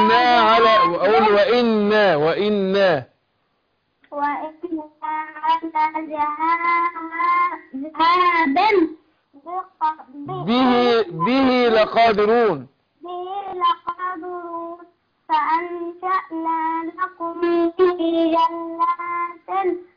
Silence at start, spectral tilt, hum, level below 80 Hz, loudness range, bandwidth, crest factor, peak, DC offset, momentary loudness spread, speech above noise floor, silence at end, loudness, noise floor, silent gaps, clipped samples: 0 s; -6.5 dB/octave; none; -58 dBFS; 6 LU; 5.2 kHz; 14 dB; -6 dBFS; under 0.1%; 14 LU; 49 dB; 0.15 s; -19 LUFS; -68 dBFS; none; under 0.1%